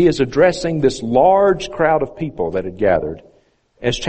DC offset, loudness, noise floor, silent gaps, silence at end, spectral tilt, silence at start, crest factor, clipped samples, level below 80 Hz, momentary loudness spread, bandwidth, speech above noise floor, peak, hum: under 0.1%; -17 LUFS; -56 dBFS; none; 0 s; -5.5 dB/octave; 0 s; 16 dB; under 0.1%; -40 dBFS; 11 LU; 8.8 kHz; 40 dB; 0 dBFS; none